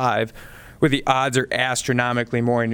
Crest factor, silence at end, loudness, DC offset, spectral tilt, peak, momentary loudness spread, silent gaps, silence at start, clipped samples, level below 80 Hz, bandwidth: 18 dB; 0 s; -21 LUFS; under 0.1%; -4.5 dB/octave; -2 dBFS; 3 LU; none; 0 s; under 0.1%; -46 dBFS; 19 kHz